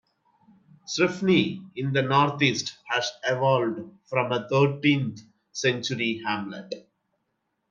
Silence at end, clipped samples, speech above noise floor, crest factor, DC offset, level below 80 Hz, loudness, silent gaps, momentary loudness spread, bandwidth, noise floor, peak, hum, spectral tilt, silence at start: 0.9 s; under 0.1%; 52 dB; 20 dB; under 0.1%; -70 dBFS; -25 LUFS; none; 12 LU; 7.6 kHz; -77 dBFS; -6 dBFS; none; -5 dB/octave; 0.9 s